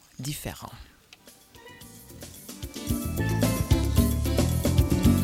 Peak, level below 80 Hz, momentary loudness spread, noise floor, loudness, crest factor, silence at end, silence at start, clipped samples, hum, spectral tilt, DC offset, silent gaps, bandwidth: -8 dBFS; -34 dBFS; 22 LU; -53 dBFS; -26 LUFS; 18 dB; 0 s; 0.2 s; under 0.1%; none; -6 dB/octave; under 0.1%; none; 16.5 kHz